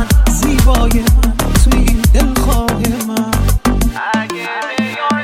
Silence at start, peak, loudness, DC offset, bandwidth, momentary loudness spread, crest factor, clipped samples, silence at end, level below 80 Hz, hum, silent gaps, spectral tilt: 0 s; 0 dBFS; -14 LUFS; under 0.1%; 16.5 kHz; 6 LU; 12 dB; under 0.1%; 0 s; -14 dBFS; none; none; -5 dB/octave